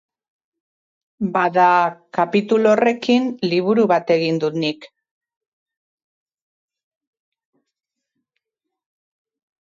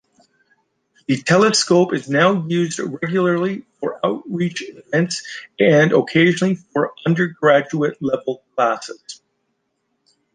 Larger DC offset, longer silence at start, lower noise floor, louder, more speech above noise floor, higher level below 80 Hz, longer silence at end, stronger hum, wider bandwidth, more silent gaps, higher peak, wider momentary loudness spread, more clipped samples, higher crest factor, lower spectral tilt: neither; about the same, 1.2 s vs 1.1 s; first, -82 dBFS vs -71 dBFS; about the same, -18 LUFS vs -18 LUFS; first, 65 dB vs 53 dB; second, -68 dBFS vs -62 dBFS; first, 4.75 s vs 1.2 s; neither; second, 7.6 kHz vs 10 kHz; neither; about the same, -4 dBFS vs -2 dBFS; second, 8 LU vs 13 LU; neither; about the same, 18 dB vs 16 dB; first, -6.5 dB/octave vs -5 dB/octave